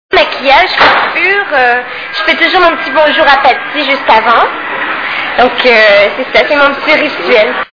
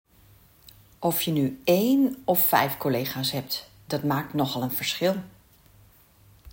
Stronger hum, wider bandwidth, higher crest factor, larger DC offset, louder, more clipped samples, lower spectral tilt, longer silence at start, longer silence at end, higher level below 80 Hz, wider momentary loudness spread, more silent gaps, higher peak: neither; second, 5.4 kHz vs 17 kHz; second, 8 dB vs 20 dB; neither; first, -7 LUFS vs -25 LUFS; first, 3% vs under 0.1%; second, -3.5 dB/octave vs -5 dB/octave; second, 0.1 s vs 1 s; about the same, 0.1 s vs 0.05 s; first, -42 dBFS vs -62 dBFS; about the same, 8 LU vs 10 LU; neither; first, 0 dBFS vs -6 dBFS